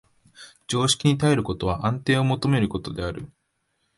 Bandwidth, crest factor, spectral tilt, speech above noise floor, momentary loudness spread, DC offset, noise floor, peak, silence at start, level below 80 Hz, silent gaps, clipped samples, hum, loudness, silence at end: 11.5 kHz; 18 dB; -5 dB/octave; 50 dB; 13 LU; under 0.1%; -73 dBFS; -6 dBFS; 0.4 s; -46 dBFS; none; under 0.1%; none; -23 LUFS; 0.7 s